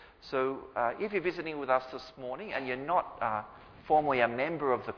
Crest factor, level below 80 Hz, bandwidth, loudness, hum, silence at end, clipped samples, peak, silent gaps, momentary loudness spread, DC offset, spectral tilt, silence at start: 22 dB; -64 dBFS; 5.4 kHz; -32 LUFS; none; 0 s; under 0.1%; -10 dBFS; none; 12 LU; under 0.1%; -7 dB/octave; 0 s